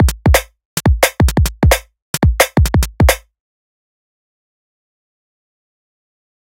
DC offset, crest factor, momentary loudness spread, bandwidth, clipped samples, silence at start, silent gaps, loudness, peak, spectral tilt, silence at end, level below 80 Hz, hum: under 0.1%; 16 dB; 5 LU; 17 kHz; under 0.1%; 0 s; 0.65-0.77 s, 2.02-2.14 s; -14 LUFS; 0 dBFS; -5 dB/octave; 3.3 s; -20 dBFS; none